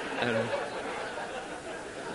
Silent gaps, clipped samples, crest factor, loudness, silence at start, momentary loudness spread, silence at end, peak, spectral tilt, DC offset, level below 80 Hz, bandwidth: none; under 0.1%; 22 dB; -34 LUFS; 0 s; 10 LU; 0 s; -12 dBFS; -4 dB/octave; under 0.1%; -62 dBFS; 11.5 kHz